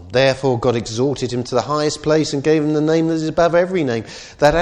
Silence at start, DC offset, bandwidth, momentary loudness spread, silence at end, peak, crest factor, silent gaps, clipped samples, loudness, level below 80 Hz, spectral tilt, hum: 0 s; under 0.1%; 11 kHz; 5 LU; 0 s; 0 dBFS; 16 dB; none; under 0.1%; -18 LUFS; -42 dBFS; -5.5 dB/octave; none